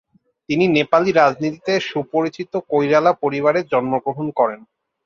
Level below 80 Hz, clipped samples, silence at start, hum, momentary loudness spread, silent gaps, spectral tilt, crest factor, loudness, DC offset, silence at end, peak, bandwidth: -62 dBFS; under 0.1%; 0.5 s; none; 8 LU; none; -6 dB/octave; 16 dB; -18 LUFS; under 0.1%; 0.5 s; -2 dBFS; 7.2 kHz